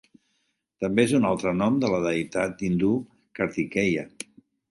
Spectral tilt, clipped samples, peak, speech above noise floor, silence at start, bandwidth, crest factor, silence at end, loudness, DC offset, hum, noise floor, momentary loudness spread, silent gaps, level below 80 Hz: -6 dB/octave; under 0.1%; -6 dBFS; 50 dB; 0.8 s; 11.5 kHz; 20 dB; 0.6 s; -25 LUFS; under 0.1%; none; -74 dBFS; 13 LU; none; -56 dBFS